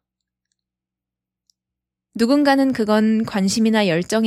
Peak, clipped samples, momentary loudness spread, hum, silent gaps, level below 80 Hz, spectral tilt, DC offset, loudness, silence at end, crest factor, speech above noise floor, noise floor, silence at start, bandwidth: -4 dBFS; under 0.1%; 5 LU; none; none; -60 dBFS; -5 dB/octave; under 0.1%; -18 LUFS; 0 s; 16 dB; 70 dB; -86 dBFS; 2.15 s; 13 kHz